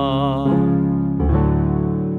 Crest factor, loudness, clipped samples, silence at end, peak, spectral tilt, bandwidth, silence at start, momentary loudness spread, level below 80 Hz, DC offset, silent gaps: 12 dB; -18 LUFS; under 0.1%; 0 s; -4 dBFS; -10.5 dB/octave; 4.2 kHz; 0 s; 3 LU; -28 dBFS; under 0.1%; none